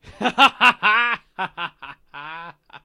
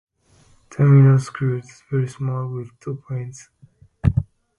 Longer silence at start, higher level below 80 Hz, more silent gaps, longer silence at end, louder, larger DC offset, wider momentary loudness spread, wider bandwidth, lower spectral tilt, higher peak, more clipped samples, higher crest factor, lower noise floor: second, 0.1 s vs 0.7 s; second, -58 dBFS vs -40 dBFS; neither; second, 0.05 s vs 0.35 s; first, -17 LUFS vs -20 LUFS; neither; first, 23 LU vs 19 LU; first, 16.5 kHz vs 10.5 kHz; second, -2.5 dB/octave vs -9 dB/octave; about the same, 0 dBFS vs -2 dBFS; neither; about the same, 20 dB vs 18 dB; second, -41 dBFS vs -55 dBFS